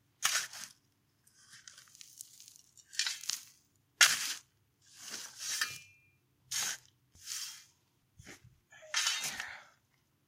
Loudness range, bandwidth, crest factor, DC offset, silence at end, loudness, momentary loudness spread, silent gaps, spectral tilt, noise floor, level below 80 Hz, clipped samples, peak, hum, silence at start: 9 LU; 16.5 kHz; 32 dB; under 0.1%; 0.65 s; -34 LUFS; 25 LU; none; 2.5 dB/octave; -74 dBFS; -80 dBFS; under 0.1%; -8 dBFS; none; 0.2 s